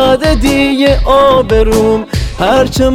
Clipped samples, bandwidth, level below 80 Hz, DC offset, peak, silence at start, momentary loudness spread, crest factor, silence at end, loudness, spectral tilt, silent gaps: under 0.1%; 16 kHz; -18 dBFS; under 0.1%; 0 dBFS; 0 s; 5 LU; 8 dB; 0 s; -10 LUFS; -5.5 dB/octave; none